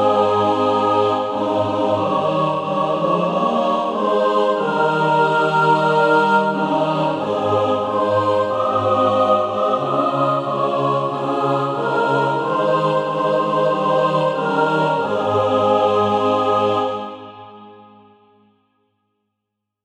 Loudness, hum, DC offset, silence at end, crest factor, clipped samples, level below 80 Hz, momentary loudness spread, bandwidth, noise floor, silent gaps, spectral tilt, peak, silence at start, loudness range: -18 LUFS; none; under 0.1%; 2.1 s; 14 dB; under 0.1%; -64 dBFS; 4 LU; 10 kHz; -79 dBFS; none; -6.5 dB/octave; -4 dBFS; 0 s; 3 LU